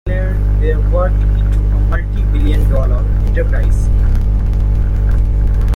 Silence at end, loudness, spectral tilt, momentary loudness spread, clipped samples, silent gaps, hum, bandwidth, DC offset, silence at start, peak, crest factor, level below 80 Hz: 0 s; -15 LUFS; -8.5 dB/octave; 2 LU; under 0.1%; none; none; 4 kHz; under 0.1%; 0.05 s; -2 dBFS; 8 dB; -12 dBFS